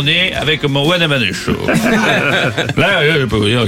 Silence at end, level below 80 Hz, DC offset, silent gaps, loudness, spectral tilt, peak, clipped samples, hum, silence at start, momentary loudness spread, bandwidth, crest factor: 0 s; -38 dBFS; 0.4%; none; -13 LUFS; -5 dB/octave; 0 dBFS; under 0.1%; none; 0 s; 3 LU; 16.5 kHz; 14 dB